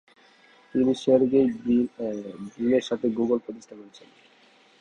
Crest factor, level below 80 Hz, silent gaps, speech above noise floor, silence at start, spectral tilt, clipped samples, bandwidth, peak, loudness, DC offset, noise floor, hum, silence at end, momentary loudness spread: 18 dB; -62 dBFS; none; 33 dB; 0.75 s; -6.5 dB/octave; under 0.1%; 9.4 kHz; -8 dBFS; -24 LUFS; under 0.1%; -58 dBFS; none; 0.9 s; 19 LU